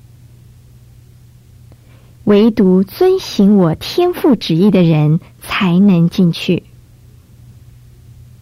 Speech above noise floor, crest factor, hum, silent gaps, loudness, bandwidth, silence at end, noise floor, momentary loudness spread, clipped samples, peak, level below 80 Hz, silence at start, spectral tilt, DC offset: 31 dB; 12 dB; none; none; -12 LUFS; 15.5 kHz; 1.85 s; -42 dBFS; 7 LU; under 0.1%; -2 dBFS; -46 dBFS; 2.25 s; -7.5 dB/octave; under 0.1%